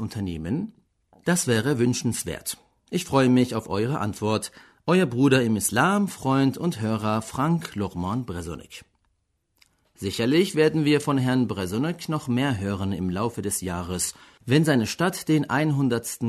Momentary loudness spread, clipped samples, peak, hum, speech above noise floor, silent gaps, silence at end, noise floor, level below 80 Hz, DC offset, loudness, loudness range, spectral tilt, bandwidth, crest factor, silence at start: 11 LU; under 0.1%; -6 dBFS; none; 48 dB; none; 0 s; -72 dBFS; -54 dBFS; under 0.1%; -24 LUFS; 5 LU; -5.5 dB/octave; 13.5 kHz; 20 dB; 0 s